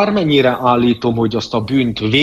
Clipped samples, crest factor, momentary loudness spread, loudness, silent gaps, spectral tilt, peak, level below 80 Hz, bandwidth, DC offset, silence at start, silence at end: under 0.1%; 14 dB; 5 LU; -15 LUFS; none; -6.5 dB/octave; 0 dBFS; -44 dBFS; 13.5 kHz; under 0.1%; 0 s; 0 s